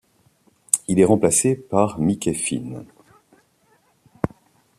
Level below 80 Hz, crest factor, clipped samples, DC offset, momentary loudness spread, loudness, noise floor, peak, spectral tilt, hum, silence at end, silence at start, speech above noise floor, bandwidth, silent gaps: -54 dBFS; 22 dB; under 0.1%; under 0.1%; 13 LU; -20 LUFS; -61 dBFS; 0 dBFS; -5 dB/octave; none; 0.5 s; 0.75 s; 42 dB; 14.5 kHz; none